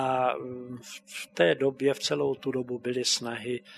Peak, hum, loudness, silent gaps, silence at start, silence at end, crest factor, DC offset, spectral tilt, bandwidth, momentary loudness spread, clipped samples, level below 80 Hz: -8 dBFS; none; -28 LUFS; none; 0 s; 0 s; 20 dB; under 0.1%; -3.5 dB/octave; 13.5 kHz; 15 LU; under 0.1%; -74 dBFS